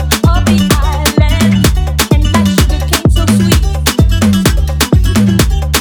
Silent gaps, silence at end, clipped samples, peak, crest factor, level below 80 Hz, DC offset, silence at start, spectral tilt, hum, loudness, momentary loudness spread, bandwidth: none; 0 s; under 0.1%; 0 dBFS; 10 dB; -14 dBFS; under 0.1%; 0 s; -5 dB/octave; none; -10 LUFS; 2 LU; over 20 kHz